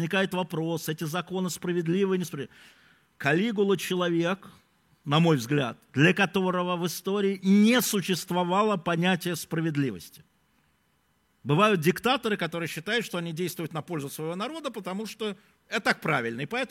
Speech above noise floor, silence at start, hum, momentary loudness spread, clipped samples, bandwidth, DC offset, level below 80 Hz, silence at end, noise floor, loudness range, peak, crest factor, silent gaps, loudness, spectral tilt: 43 dB; 0 s; none; 12 LU; under 0.1%; 16.5 kHz; under 0.1%; -70 dBFS; 0.05 s; -69 dBFS; 6 LU; -6 dBFS; 20 dB; none; -27 LUFS; -5 dB/octave